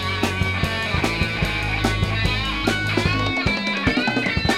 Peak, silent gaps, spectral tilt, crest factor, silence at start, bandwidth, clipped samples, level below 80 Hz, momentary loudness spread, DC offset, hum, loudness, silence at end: -4 dBFS; none; -5 dB/octave; 18 dB; 0 s; 16 kHz; under 0.1%; -32 dBFS; 2 LU; 0.2%; none; -21 LUFS; 0 s